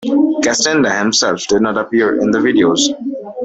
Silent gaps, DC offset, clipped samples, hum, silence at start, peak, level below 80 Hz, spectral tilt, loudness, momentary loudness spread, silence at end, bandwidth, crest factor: none; under 0.1%; under 0.1%; none; 0 s; -2 dBFS; -52 dBFS; -3 dB/octave; -13 LUFS; 3 LU; 0 s; 8.4 kHz; 12 dB